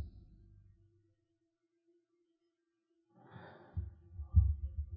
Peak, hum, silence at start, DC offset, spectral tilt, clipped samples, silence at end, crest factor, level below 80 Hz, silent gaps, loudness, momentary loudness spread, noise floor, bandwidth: -16 dBFS; none; 0 s; under 0.1%; -10 dB/octave; under 0.1%; 0 s; 24 dB; -42 dBFS; none; -36 LUFS; 24 LU; -84 dBFS; 3.7 kHz